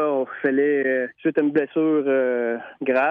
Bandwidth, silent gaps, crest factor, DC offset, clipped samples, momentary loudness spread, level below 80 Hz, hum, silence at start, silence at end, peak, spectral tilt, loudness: 4.7 kHz; none; 12 dB; under 0.1%; under 0.1%; 4 LU; -74 dBFS; none; 0 s; 0 s; -8 dBFS; -9 dB/octave; -22 LUFS